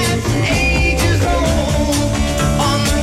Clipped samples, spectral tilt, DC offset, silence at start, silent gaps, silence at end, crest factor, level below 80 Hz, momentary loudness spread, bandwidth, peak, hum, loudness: under 0.1%; -4.5 dB/octave; under 0.1%; 0 s; none; 0 s; 10 dB; -22 dBFS; 2 LU; 16 kHz; -4 dBFS; none; -15 LUFS